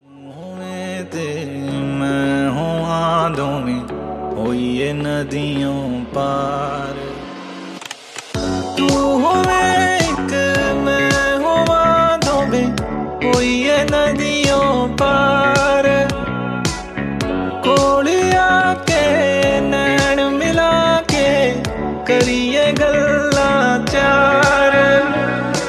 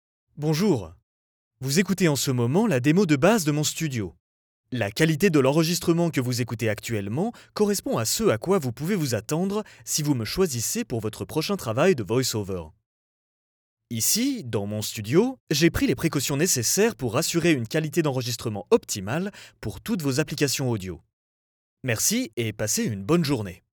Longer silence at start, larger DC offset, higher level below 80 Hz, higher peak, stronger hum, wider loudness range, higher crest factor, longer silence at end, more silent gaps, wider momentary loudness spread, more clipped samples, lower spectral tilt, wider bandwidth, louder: second, 0.15 s vs 0.35 s; neither; first, -36 dBFS vs -54 dBFS; first, 0 dBFS vs -6 dBFS; neither; first, 7 LU vs 4 LU; about the same, 16 dB vs 18 dB; second, 0 s vs 0.15 s; second, none vs 1.03-1.51 s, 4.20-4.64 s, 12.86-13.77 s, 15.40-15.47 s, 21.13-21.77 s, 22.33-22.37 s; first, 12 LU vs 9 LU; neither; about the same, -4.5 dB/octave vs -4.5 dB/octave; second, 14 kHz vs over 20 kHz; first, -16 LUFS vs -24 LUFS